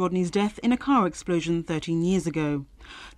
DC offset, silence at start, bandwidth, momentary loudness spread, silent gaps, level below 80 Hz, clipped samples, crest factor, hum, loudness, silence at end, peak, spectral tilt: under 0.1%; 0 s; 12 kHz; 8 LU; none; -50 dBFS; under 0.1%; 16 dB; none; -25 LUFS; 0.1 s; -10 dBFS; -6.5 dB/octave